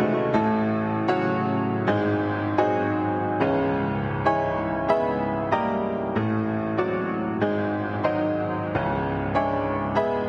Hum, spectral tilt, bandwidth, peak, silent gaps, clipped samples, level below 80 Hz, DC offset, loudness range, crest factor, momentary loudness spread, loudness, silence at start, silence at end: none; -8.5 dB/octave; 7.2 kHz; -8 dBFS; none; under 0.1%; -48 dBFS; under 0.1%; 2 LU; 16 dB; 3 LU; -24 LUFS; 0 s; 0 s